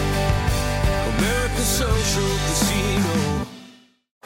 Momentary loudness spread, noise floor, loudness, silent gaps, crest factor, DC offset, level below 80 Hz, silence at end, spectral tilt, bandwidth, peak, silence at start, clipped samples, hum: 3 LU; -49 dBFS; -21 LUFS; none; 14 dB; under 0.1%; -28 dBFS; 0.55 s; -4 dB/octave; 17 kHz; -8 dBFS; 0 s; under 0.1%; none